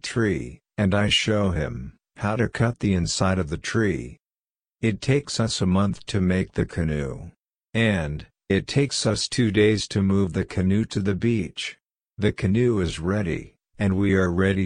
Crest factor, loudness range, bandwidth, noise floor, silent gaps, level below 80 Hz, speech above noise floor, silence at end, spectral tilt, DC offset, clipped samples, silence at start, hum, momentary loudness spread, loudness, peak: 16 dB; 3 LU; 10.5 kHz; under -90 dBFS; none; -42 dBFS; over 67 dB; 0 s; -5.5 dB/octave; under 0.1%; under 0.1%; 0.05 s; none; 10 LU; -24 LUFS; -6 dBFS